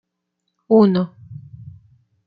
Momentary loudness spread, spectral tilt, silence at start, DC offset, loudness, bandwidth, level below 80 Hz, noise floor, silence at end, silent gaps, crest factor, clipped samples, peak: 25 LU; -11 dB/octave; 0.7 s; under 0.1%; -17 LUFS; 5.2 kHz; -62 dBFS; -76 dBFS; 0.9 s; none; 18 dB; under 0.1%; -2 dBFS